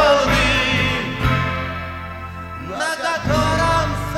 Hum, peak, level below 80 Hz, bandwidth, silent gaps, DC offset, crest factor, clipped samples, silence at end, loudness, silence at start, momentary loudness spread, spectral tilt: none; -4 dBFS; -32 dBFS; 16.5 kHz; none; under 0.1%; 16 dB; under 0.1%; 0 s; -19 LUFS; 0 s; 15 LU; -4.5 dB/octave